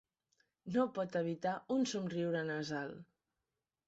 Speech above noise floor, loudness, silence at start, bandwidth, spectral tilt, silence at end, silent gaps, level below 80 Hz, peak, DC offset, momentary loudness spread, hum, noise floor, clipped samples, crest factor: over 53 dB; -38 LUFS; 0.65 s; 8 kHz; -5 dB/octave; 0.85 s; none; -78 dBFS; -22 dBFS; under 0.1%; 9 LU; none; under -90 dBFS; under 0.1%; 18 dB